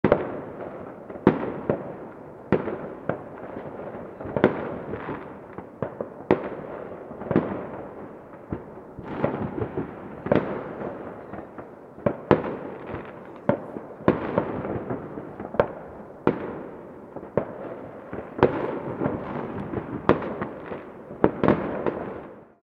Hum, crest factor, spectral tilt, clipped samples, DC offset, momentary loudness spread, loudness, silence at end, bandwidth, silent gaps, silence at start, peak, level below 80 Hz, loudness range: none; 28 dB; -9.5 dB/octave; under 0.1%; under 0.1%; 16 LU; -29 LUFS; 0.15 s; 5.8 kHz; none; 0.05 s; 0 dBFS; -52 dBFS; 4 LU